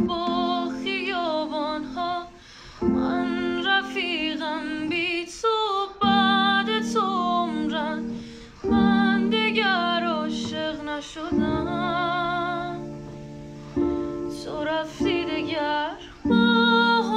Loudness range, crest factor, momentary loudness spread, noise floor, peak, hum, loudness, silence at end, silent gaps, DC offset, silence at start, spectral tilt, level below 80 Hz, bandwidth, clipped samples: 5 LU; 16 dB; 13 LU; -45 dBFS; -8 dBFS; none; -24 LUFS; 0 s; none; under 0.1%; 0 s; -5 dB/octave; -50 dBFS; 10 kHz; under 0.1%